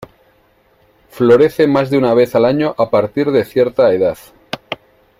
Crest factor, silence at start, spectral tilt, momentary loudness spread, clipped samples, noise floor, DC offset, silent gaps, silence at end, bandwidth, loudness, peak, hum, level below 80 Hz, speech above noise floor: 14 dB; 1.15 s; -7 dB/octave; 18 LU; under 0.1%; -54 dBFS; under 0.1%; none; 0.45 s; 16 kHz; -13 LUFS; 0 dBFS; none; -52 dBFS; 41 dB